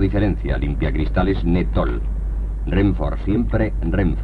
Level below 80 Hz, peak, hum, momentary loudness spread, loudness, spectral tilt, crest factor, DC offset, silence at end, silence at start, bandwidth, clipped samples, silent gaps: -22 dBFS; -4 dBFS; none; 7 LU; -21 LUFS; -9.5 dB/octave; 14 dB; under 0.1%; 0 s; 0 s; 4.6 kHz; under 0.1%; none